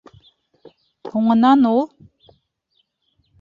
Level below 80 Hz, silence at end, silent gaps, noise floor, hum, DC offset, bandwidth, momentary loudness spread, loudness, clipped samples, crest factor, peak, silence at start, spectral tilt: -62 dBFS; 1.55 s; none; -68 dBFS; none; under 0.1%; 7 kHz; 16 LU; -17 LUFS; under 0.1%; 16 dB; -4 dBFS; 1.05 s; -8 dB/octave